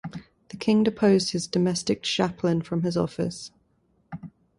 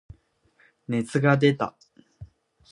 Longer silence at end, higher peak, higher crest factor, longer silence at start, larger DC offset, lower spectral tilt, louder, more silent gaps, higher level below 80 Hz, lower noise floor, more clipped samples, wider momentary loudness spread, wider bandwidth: second, 0.3 s vs 0.45 s; second, -8 dBFS vs -4 dBFS; about the same, 18 dB vs 22 dB; second, 0.05 s vs 0.9 s; neither; second, -5.5 dB/octave vs -7 dB/octave; about the same, -25 LUFS vs -24 LUFS; neither; about the same, -58 dBFS vs -58 dBFS; about the same, -67 dBFS vs -64 dBFS; neither; first, 21 LU vs 12 LU; about the same, 11.5 kHz vs 11 kHz